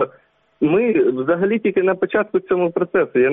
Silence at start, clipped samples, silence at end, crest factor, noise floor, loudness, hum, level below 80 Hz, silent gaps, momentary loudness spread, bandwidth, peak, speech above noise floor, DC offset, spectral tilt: 0 s; under 0.1%; 0 s; 12 dB; -54 dBFS; -18 LUFS; none; -60 dBFS; none; 4 LU; 3.8 kHz; -6 dBFS; 37 dB; under 0.1%; -6 dB/octave